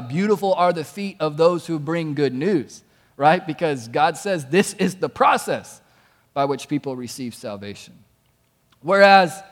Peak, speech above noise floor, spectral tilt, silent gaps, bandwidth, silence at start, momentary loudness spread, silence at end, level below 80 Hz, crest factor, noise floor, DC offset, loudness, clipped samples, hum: 0 dBFS; 43 dB; -5 dB/octave; none; 17 kHz; 0 s; 16 LU; 0.05 s; -66 dBFS; 20 dB; -63 dBFS; under 0.1%; -20 LUFS; under 0.1%; none